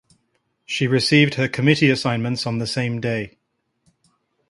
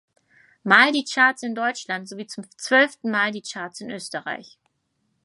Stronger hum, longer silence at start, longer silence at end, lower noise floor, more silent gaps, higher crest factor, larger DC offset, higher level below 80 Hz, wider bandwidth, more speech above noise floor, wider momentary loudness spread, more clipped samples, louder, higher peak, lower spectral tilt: neither; about the same, 0.7 s vs 0.65 s; first, 1.2 s vs 0.8 s; about the same, -73 dBFS vs -72 dBFS; neither; about the same, 20 dB vs 22 dB; neither; first, -56 dBFS vs -80 dBFS; about the same, 11.5 kHz vs 11.5 kHz; about the same, 53 dB vs 50 dB; second, 10 LU vs 19 LU; neither; about the same, -19 LUFS vs -20 LUFS; about the same, 0 dBFS vs -2 dBFS; first, -5.5 dB/octave vs -3 dB/octave